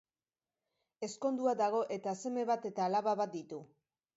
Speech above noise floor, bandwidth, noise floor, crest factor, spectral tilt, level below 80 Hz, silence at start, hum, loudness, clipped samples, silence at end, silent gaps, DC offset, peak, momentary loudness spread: over 55 dB; 7.6 kHz; under -90 dBFS; 16 dB; -5 dB/octave; -88 dBFS; 1 s; none; -35 LUFS; under 0.1%; 0.5 s; none; under 0.1%; -20 dBFS; 12 LU